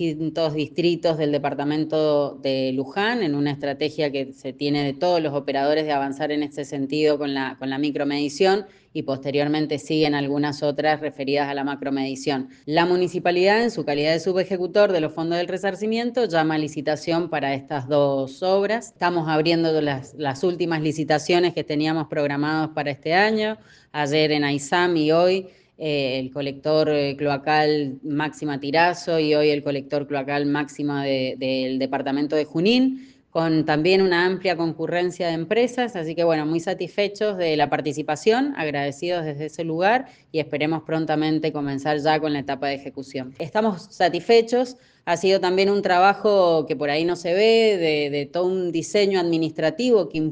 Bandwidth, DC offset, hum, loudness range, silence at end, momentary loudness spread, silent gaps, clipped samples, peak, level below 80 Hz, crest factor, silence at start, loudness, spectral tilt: 9.6 kHz; under 0.1%; none; 4 LU; 0 s; 8 LU; none; under 0.1%; -2 dBFS; -64 dBFS; 20 dB; 0 s; -22 LUFS; -5.5 dB/octave